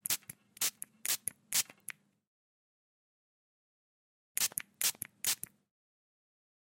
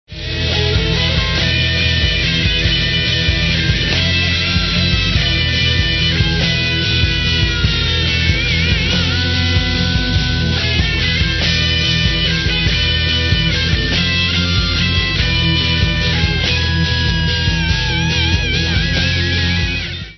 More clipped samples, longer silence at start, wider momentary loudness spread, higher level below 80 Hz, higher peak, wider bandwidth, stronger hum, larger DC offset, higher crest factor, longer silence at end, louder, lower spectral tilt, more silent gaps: neither; about the same, 0.1 s vs 0.1 s; first, 15 LU vs 2 LU; second, -84 dBFS vs -22 dBFS; second, -10 dBFS vs 0 dBFS; first, 17 kHz vs 6.4 kHz; neither; neither; first, 30 dB vs 14 dB; first, 1.35 s vs 0 s; second, -34 LUFS vs -14 LUFS; second, 1.5 dB/octave vs -4.5 dB/octave; first, 2.27-4.35 s vs none